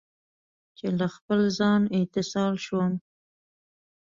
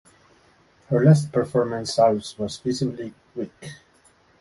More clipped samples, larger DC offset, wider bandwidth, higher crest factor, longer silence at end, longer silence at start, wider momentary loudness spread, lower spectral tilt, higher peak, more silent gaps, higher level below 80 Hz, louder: neither; neither; second, 7.6 kHz vs 11.5 kHz; second, 14 dB vs 20 dB; first, 1.05 s vs 0.65 s; about the same, 0.85 s vs 0.9 s; second, 7 LU vs 18 LU; about the same, -6.5 dB/octave vs -7 dB/octave; second, -12 dBFS vs -4 dBFS; first, 1.21-1.29 s vs none; second, -66 dBFS vs -58 dBFS; second, -26 LUFS vs -22 LUFS